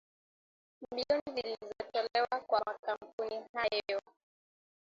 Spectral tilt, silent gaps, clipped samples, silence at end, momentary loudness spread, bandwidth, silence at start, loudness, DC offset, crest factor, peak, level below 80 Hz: 0 dB/octave; 1.21-1.26 s, 2.79-2.83 s, 3.13-3.18 s, 3.49-3.54 s; under 0.1%; 0.85 s; 8 LU; 7.6 kHz; 0.8 s; -36 LUFS; under 0.1%; 20 dB; -18 dBFS; -74 dBFS